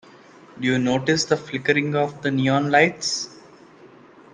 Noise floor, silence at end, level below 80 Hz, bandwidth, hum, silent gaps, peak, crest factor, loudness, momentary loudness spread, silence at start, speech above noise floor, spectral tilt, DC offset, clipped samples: -48 dBFS; 0.5 s; -62 dBFS; 10 kHz; none; none; -2 dBFS; 20 dB; -21 LUFS; 7 LU; 0.55 s; 27 dB; -4.5 dB/octave; under 0.1%; under 0.1%